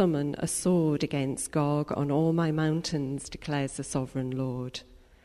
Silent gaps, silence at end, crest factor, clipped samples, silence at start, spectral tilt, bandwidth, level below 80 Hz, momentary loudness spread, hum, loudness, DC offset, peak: none; 0.25 s; 14 dB; under 0.1%; 0 s; -6 dB/octave; 13.5 kHz; -54 dBFS; 8 LU; none; -29 LUFS; under 0.1%; -14 dBFS